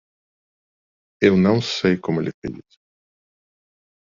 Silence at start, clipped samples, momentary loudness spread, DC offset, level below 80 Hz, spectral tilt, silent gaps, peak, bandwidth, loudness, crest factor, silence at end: 1.2 s; under 0.1%; 15 LU; under 0.1%; -58 dBFS; -5.5 dB/octave; 2.34-2.42 s; -4 dBFS; 7.6 kHz; -19 LUFS; 20 dB; 1.55 s